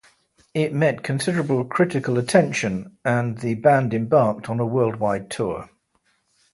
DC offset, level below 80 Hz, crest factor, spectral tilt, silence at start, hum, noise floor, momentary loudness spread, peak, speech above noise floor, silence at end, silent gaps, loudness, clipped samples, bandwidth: under 0.1%; -56 dBFS; 20 dB; -6.5 dB/octave; 0.55 s; none; -67 dBFS; 9 LU; -2 dBFS; 46 dB; 0.9 s; none; -22 LUFS; under 0.1%; 11.5 kHz